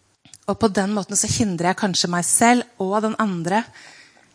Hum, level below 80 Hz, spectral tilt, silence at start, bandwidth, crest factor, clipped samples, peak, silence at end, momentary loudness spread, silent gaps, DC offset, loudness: none; -54 dBFS; -3.5 dB/octave; 0.5 s; 10.5 kHz; 20 dB; under 0.1%; -2 dBFS; 0.45 s; 8 LU; none; under 0.1%; -20 LUFS